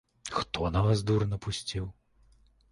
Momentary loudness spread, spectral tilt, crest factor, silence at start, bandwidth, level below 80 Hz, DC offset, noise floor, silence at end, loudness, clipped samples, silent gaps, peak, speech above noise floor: 10 LU; -6 dB/octave; 18 dB; 0.25 s; 11.5 kHz; -46 dBFS; under 0.1%; -63 dBFS; 0.8 s; -30 LUFS; under 0.1%; none; -12 dBFS; 34 dB